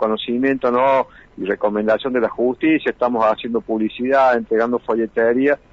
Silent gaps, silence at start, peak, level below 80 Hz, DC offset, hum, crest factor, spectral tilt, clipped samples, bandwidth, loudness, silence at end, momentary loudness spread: none; 0 s; -6 dBFS; -54 dBFS; under 0.1%; none; 12 dB; -7 dB/octave; under 0.1%; 7.4 kHz; -18 LUFS; 0.15 s; 6 LU